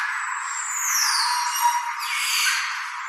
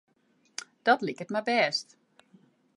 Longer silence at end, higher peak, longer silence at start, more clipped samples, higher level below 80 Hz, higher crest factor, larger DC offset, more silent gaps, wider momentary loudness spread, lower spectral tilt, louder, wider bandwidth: second, 0 s vs 0.95 s; about the same, -8 dBFS vs -8 dBFS; second, 0 s vs 0.85 s; neither; second, under -90 dBFS vs -84 dBFS; second, 16 dB vs 24 dB; neither; neither; second, 7 LU vs 16 LU; second, 13.5 dB/octave vs -3.5 dB/octave; first, -22 LUFS vs -28 LUFS; first, 15.5 kHz vs 11.5 kHz